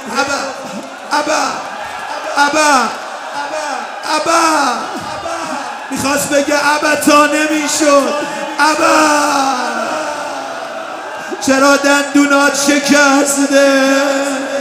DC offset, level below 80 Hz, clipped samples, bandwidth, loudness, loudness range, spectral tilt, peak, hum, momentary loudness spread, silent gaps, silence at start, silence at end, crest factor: under 0.1%; -56 dBFS; under 0.1%; 16 kHz; -13 LUFS; 5 LU; -2 dB/octave; 0 dBFS; none; 13 LU; none; 0 s; 0 s; 14 dB